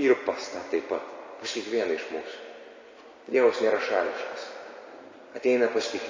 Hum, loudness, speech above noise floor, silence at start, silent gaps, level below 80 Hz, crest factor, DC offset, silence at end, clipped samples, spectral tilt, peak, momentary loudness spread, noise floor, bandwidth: none; -28 LUFS; 23 dB; 0 s; none; -74 dBFS; 18 dB; under 0.1%; 0 s; under 0.1%; -3 dB/octave; -10 dBFS; 22 LU; -49 dBFS; 7.6 kHz